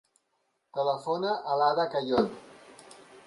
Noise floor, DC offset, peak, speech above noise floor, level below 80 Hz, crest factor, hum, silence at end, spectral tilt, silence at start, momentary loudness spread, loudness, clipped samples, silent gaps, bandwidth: -76 dBFS; under 0.1%; -12 dBFS; 49 dB; -68 dBFS; 18 dB; none; 0.05 s; -5.5 dB/octave; 0.75 s; 8 LU; -29 LUFS; under 0.1%; none; 11.5 kHz